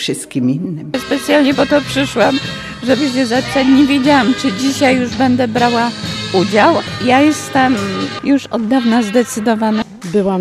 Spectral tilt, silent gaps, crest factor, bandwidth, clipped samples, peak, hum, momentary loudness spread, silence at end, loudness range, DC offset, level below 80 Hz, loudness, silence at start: -5 dB/octave; none; 14 dB; 14.5 kHz; under 0.1%; 0 dBFS; none; 8 LU; 0 s; 2 LU; under 0.1%; -46 dBFS; -14 LUFS; 0 s